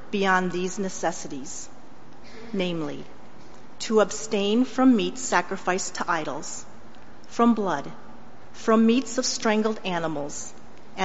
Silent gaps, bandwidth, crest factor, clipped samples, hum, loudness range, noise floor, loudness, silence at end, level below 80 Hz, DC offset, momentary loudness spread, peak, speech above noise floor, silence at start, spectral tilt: none; 8 kHz; 20 dB; under 0.1%; none; 6 LU; -49 dBFS; -25 LUFS; 0 s; -60 dBFS; 2%; 18 LU; -6 dBFS; 24 dB; 0 s; -4 dB/octave